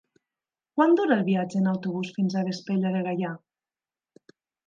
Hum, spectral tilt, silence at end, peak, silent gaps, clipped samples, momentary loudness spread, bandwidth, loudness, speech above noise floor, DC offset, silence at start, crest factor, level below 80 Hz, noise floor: none; -7.5 dB/octave; 1.3 s; -8 dBFS; none; under 0.1%; 10 LU; 7.4 kHz; -26 LUFS; over 66 dB; under 0.1%; 0.75 s; 20 dB; -78 dBFS; under -90 dBFS